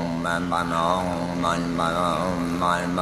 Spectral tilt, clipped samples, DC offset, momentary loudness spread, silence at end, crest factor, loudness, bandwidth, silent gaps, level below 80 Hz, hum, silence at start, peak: -5.5 dB/octave; under 0.1%; under 0.1%; 3 LU; 0 s; 18 dB; -24 LUFS; 14.5 kHz; none; -46 dBFS; none; 0 s; -6 dBFS